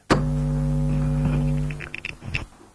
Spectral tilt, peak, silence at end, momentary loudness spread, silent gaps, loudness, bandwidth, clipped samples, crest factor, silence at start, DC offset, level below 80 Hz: -7 dB/octave; -6 dBFS; 0.3 s; 9 LU; none; -25 LUFS; 11 kHz; under 0.1%; 18 dB; 0.1 s; under 0.1%; -32 dBFS